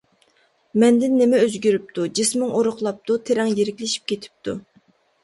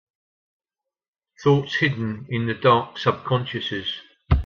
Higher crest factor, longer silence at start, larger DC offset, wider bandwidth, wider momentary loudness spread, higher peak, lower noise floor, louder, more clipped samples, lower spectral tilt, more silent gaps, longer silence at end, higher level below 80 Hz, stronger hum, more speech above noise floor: about the same, 16 dB vs 20 dB; second, 0.75 s vs 1.4 s; neither; first, 11.5 kHz vs 7 kHz; first, 12 LU vs 9 LU; about the same, -4 dBFS vs -4 dBFS; second, -62 dBFS vs -88 dBFS; first, -20 LUFS vs -23 LUFS; neither; second, -4 dB/octave vs -7 dB/octave; neither; first, 0.65 s vs 0 s; second, -64 dBFS vs -36 dBFS; neither; second, 42 dB vs 66 dB